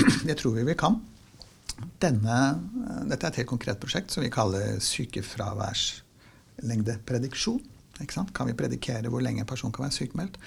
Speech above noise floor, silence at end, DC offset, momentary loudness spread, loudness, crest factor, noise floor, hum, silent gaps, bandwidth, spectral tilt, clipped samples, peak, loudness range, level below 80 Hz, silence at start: 27 dB; 0 s; under 0.1%; 9 LU; -29 LUFS; 22 dB; -56 dBFS; none; none; 16 kHz; -5 dB/octave; under 0.1%; -8 dBFS; 3 LU; -50 dBFS; 0 s